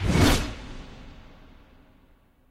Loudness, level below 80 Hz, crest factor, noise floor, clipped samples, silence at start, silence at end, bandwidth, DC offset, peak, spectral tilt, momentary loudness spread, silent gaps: -23 LUFS; -34 dBFS; 20 dB; -59 dBFS; under 0.1%; 0 s; 1.3 s; 16 kHz; under 0.1%; -6 dBFS; -5 dB/octave; 26 LU; none